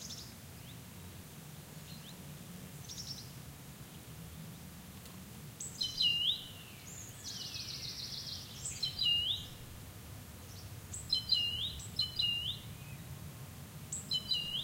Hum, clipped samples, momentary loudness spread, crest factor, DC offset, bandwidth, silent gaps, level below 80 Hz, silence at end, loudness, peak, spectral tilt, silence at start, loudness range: none; under 0.1%; 19 LU; 22 dB; under 0.1%; 16 kHz; none; -60 dBFS; 0 s; -36 LUFS; -18 dBFS; -1.5 dB/octave; 0 s; 13 LU